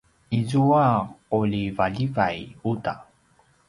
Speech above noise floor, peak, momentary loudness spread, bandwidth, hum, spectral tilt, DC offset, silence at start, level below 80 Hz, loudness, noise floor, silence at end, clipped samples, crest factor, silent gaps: 38 dB; -6 dBFS; 10 LU; 11.5 kHz; none; -8 dB/octave; under 0.1%; 0.3 s; -52 dBFS; -24 LUFS; -61 dBFS; 0.65 s; under 0.1%; 18 dB; none